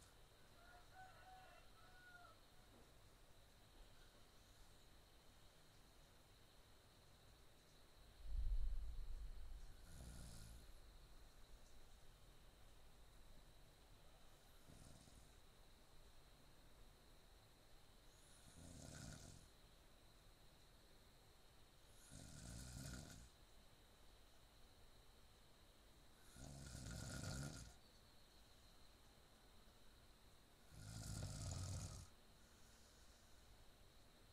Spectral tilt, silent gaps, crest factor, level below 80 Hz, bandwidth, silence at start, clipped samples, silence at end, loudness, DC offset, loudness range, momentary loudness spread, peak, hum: -4 dB/octave; none; 24 dB; -60 dBFS; 15.5 kHz; 0 s; under 0.1%; 0 s; -61 LUFS; under 0.1%; 13 LU; 17 LU; -34 dBFS; none